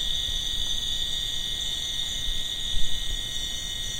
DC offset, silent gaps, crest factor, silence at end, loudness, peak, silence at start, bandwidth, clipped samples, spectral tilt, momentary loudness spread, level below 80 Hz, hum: under 0.1%; none; 16 dB; 0 s; -27 LUFS; -10 dBFS; 0 s; 16 kHz; under 0.1%; -0.5 dB/octave; 3 LU; -36 dBFS; none